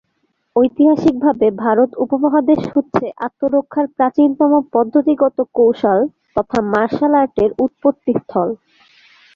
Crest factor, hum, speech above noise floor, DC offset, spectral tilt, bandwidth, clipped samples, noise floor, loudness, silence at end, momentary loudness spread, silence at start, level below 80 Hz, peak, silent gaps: 14 dB; none; 52 dB; under 0.1%; -8.5 dB/octave; 7 kHz; under 0.1%; -66 dBFS; -16 LUFS; 0.8 s; 7 LU; 0.55 s; -52 dBFS; -2 dBFS; none